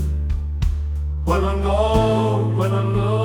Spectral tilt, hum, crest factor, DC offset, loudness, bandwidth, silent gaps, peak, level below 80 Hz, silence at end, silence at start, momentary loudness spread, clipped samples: -7.5 dB/octave; none; 12 dB; under 0.1%; -20 LUFS; 12 kHz; none; -6 dBFS; -24 dBFS; 0 s; 0 s; 7 LU; under 0.1%